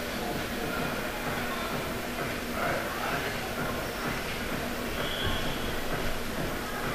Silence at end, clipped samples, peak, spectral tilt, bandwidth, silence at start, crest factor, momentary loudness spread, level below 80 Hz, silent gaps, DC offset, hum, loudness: 0 s; under 0.1%; -16 dBFS; -4 dB/octave; 15.5 kHz; 0 s; 16 dB; 3 LU; -40 dBFS; none; under 0.1%; none; -32 LUFS